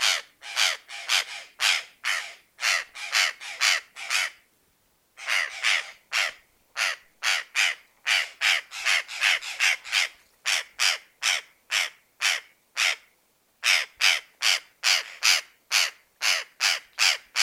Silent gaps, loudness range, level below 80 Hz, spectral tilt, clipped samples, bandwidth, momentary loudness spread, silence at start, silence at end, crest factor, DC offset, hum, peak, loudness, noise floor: none; 3 LU; -78 dBFS; 5.5 dB/octave; under 0.1%; 17 kHz; 7 LU; 0 s; 0 s; 22 dB; under 0.1%; none; -4 dBFS; -24 LUFS; -67 dBFS